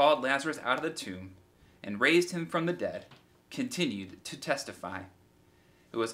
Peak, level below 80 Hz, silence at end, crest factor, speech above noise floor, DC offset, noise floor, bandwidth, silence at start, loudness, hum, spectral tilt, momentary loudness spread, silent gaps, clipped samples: -10 dBFS; -74 dBFS; 0 s; 22 dB; 31 dB; under 0.1%; -63 dBFS; 16 kHz; 0 s; -31 LUFS; none; -4 dB/octave; 19 LU; none; under 0.1%